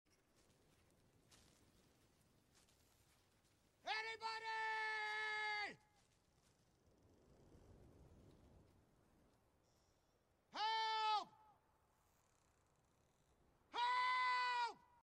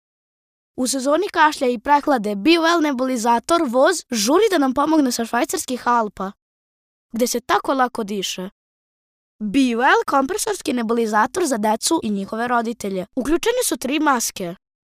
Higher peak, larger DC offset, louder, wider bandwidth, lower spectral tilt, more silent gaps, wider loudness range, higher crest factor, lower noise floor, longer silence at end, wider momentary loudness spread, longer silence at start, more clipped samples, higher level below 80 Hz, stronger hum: second, -30 dBFS vs -4 dBFS; neither; second, -43 LUFS vs -19 LUFS; second, 13.5 kHz vs 16 kHz; second, -1 dB/octave vs -3 dB/octave; second, none vs 6.42-7.09 s, 8.52-9.39 s; first, 8 LU vs 5 LU; about the same, 18 dB vs 16 dB; second, -80 dBFS vs under -90 dBFS; second, 0.25 s vs 0.45 s; about the same, 10 LU vs 9 LU; first, 1.3 s vs 0.75 s; neither; second, -82 dBFS vs -52 dBFS; neither